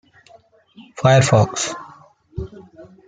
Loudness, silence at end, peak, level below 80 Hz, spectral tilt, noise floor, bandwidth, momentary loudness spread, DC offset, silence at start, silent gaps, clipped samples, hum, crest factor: -16 LUFS; 0.25 s; -2 dBFS; -48 dBFS; -5 dB/octave; -51 dBFS; 9.4 kHz; 22 LU; under 0.1%; 0.8 s; none; under 0.1%; none; 18 dB